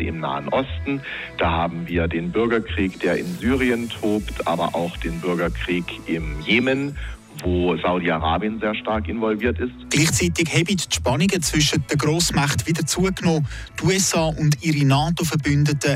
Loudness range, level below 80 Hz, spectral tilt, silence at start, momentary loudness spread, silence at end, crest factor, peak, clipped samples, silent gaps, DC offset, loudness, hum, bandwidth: 4 LU; -36 dBFS; -4.5 dB/octave; 0 s; 8 LU; 0 s; 16 dB; -6 dBFS; under 0.1%; none; under 0.1%; -21 LUFS; none; 16 kHz